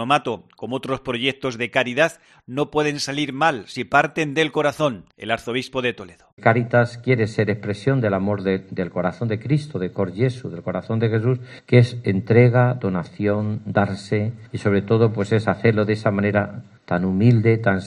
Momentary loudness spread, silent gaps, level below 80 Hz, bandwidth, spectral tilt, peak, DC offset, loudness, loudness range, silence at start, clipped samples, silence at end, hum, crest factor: 10 LU; 6.33-6.37 s; -58 dBFS; 11 kHz; -7 dB/octave; 0 dBFS; under 0.1%; -21 LUFS; 4 LU; 0 s; under 0.1%; 0 s; none; 20 dB